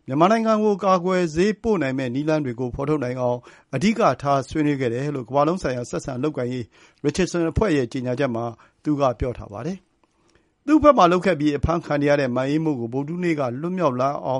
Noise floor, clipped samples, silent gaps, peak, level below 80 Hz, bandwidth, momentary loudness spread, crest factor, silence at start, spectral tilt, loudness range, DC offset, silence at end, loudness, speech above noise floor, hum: -62 dBFS; under 0.1%; none; -2 dBFS; -42 dBFS; 11.5 kHz; 11 LU; 20 dB; 0.1 s; -6.5 dB/octave; 4 LU; under 0.1%; 0 s; -22 LUFS; 40 dB; none